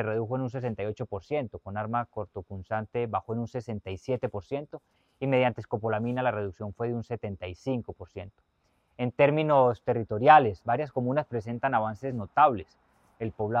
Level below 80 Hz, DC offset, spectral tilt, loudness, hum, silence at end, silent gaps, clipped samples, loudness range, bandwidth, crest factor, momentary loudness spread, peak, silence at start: -60 dBFS; under 0.1%; -8 dB/octave; -28 LUFS; none; 0 s; none; under 0.1%; 9 LU; 7.6 kHz; 24 dB; 14 LU; -4 dBFS; 0 s